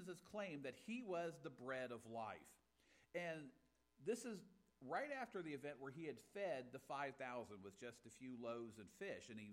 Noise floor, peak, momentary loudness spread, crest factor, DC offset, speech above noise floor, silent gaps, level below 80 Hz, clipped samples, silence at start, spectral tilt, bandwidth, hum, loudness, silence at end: -77 dBFS; -34 dBFS; 10 LU; 18 dB; under 0.1%; 26 dB; none; -88 dBFS; under 0.1%; 0 s; -5 dB/octave; 16 kHz; none; -51 LUFS; 0 s